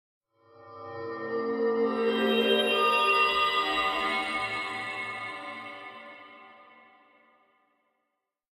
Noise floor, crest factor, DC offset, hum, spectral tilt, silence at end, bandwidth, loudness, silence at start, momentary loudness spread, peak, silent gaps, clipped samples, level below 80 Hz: -82 dBFS; 18 dB; under 0.1%; none; -3.5 dB/octave; 1.9 s; 16 kHz; -27 LUFS; 0.6 s; 20 LU; -12 dBFS; none; under 0.1%; -66 dBFS